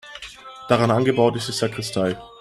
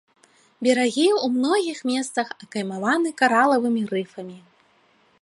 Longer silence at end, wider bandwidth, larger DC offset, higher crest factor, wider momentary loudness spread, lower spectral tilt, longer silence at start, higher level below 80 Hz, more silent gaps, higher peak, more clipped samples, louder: second, 0.15 s vs 0.85 s; first, 14 kHz vs 11.5 kHz; neither; about the same, 20 dB vs 20 dB; first, 19 LU vs 11 LU; first, -5.5 dB/octave vs -4 dB/octave; second, 0.05 s vs 0.6 s; first, -56 dBFS vs -76 dBFS; neither; about the same, -2 dBFS vs -4 dBFS; neither; about the same, -21 LUFS vs -22 LUFS